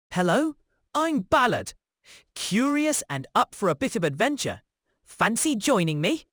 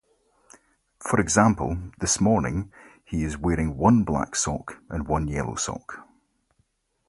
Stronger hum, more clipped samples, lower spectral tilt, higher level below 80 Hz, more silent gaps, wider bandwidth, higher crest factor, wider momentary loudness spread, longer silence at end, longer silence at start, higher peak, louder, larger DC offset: neither; neither; about the same, -4 dB/octave vs -5 dB/octave; second, -58 dBFS vs -40 dBFS; neither; first, over 20 kHz vs 11.5 kHz; about the same, 20 dB vs 24 dB; second, 9 LU vs 15 LU; second, 0.1 s vs 1.05 s; second, 0.1 s vs 1 s; second, -6 dBFS vs -2 dBFS; about the same, -25 LUFS vs -24 LUFS; neither